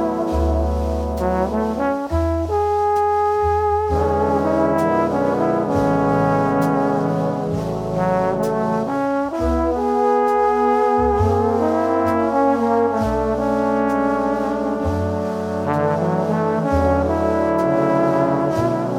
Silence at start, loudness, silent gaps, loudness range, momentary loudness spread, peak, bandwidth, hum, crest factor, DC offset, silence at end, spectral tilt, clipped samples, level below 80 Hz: 0 s; -19 LUFS; none; 3 LU; 4 LU; -4 dBFS; 16 kHz; none; 14 dB; under 0.1%; 0 s; -8 dB/octave; under 0.1%; -32 dBFS